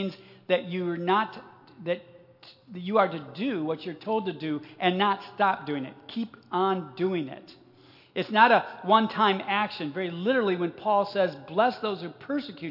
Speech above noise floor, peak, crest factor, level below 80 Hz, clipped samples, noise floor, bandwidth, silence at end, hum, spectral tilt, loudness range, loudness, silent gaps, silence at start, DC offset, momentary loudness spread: 28 dB; -4 dBFS; 22 dB; -82 dBFS; under 0.1%; -56 dBFS; 5.8 kHz; 0 s; none; -7.5 dB/octave; 6 LU; -27 LUFS; none; 0 s; under 0.1%; 12 LU